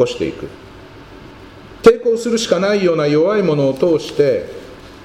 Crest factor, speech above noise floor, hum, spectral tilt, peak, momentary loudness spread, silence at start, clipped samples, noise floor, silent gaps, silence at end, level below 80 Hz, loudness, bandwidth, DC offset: 16 dB; 23 dB; none; -5.5 dB/octave; 0 dBFS; 19 LU; 0 s; 0.2%; -37 dBFS; none; 0 s; -46 dBFS; -15 LUFS; 12.5 kHz; under 0.1%